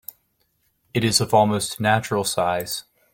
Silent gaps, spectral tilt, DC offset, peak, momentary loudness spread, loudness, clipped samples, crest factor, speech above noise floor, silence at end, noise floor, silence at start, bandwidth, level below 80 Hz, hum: none; -4 dB/octave; under 0.1%; -4 dBFS; 12 LU; -21 LUFS; under 0.1%; 20 dB; 47 dB; 0.35 s; -68 dBFS; 0.95 s; 17 kHz; -56 dBFS; none